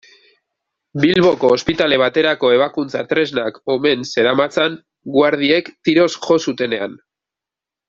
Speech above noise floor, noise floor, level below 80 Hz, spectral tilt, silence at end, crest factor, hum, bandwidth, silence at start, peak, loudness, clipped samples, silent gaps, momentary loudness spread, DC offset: 71 dB; -87 dBFS; -56 dBFS; -5 dB/octave; 0.95 s; 16 dB; none; 7.6 kHz; 0.95 s; -2 dBFS; -16 LUFS; under 0.1%; none; 8 LU; under 0.1%